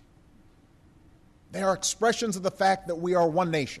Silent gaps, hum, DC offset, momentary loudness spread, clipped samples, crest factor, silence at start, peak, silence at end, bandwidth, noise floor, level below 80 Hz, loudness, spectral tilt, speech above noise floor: none; none; under 0.1%; 5 LU; under 0.1%; 16 dB; 1.5 s; -12 dBFS; 0 s; 13.5 kHz; -57 dBFS; -60 dBFS; -26 LUFS; -4 dB/octave; 31 dB